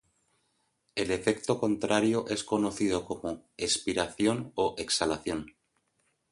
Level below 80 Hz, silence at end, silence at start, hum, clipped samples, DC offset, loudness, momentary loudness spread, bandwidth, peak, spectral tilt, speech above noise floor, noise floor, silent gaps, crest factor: -58 dBFS; 0.8 s; 0.95 s; none; under 0.1%; under 0.1%; -30 LUFS; 9 LU; 11.5 kHz; -10 dBFS; -4 dB/octave; 45 dB; -75 dBFS; none; 20 dB